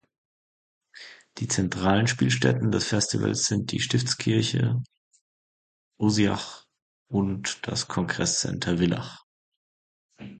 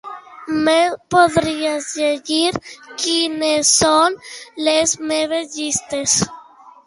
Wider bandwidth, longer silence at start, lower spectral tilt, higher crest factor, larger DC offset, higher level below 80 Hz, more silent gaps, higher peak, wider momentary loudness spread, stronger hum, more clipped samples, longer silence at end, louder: second, 9.4 kHz vs 11.5 kHz; first, 0.95 s vs 0.05 s; first, -4.5 dB/octave vs -2 dB/octave; about the same, 22 dB vs 18 dB; neither; about the same, -52 dBFS vs -52 dBFS; first, 4.97-5.11 s, 5.21-5.91 s, 6.82-7.06 s, 9.23-10.09 s vs none; second, -6 dBFS vs 0 dBFS; first, 15 LU vs 12 LU; neither; neither; second, 0 s vs 0.15 s; second, -25 LUFS vs -17 LUFS